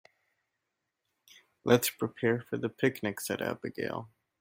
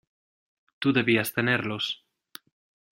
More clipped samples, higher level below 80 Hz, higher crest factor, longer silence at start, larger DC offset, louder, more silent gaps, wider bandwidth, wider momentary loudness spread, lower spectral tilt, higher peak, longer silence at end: neither; second, -72 dBFS vs -66 dBFS; about the same, 24 dB vs 22 dB; first, 1.65 s vs 0.8 s; neither; second, -32 LUFS vs -25 LUFS; neither; about the same, 16.5 kHz vs 16 kHz; about the same, 11 LU vs 9 LU; about the same, -4.5 dB/octave vs -5 dB/octave; about the same, -10 dBFS vs -8 dBFS; second, 0.35 s vs 1 s